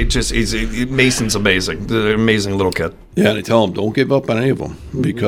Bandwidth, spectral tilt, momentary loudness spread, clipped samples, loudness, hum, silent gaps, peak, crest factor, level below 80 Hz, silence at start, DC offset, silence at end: 17 kHz; -4.5 dB/octave; 7 LU; under 0.1%; -16 LUFS; none; none; 0 dBFS; 16 dB; -30 dBFS; 0 s; under 0.1%; 0 s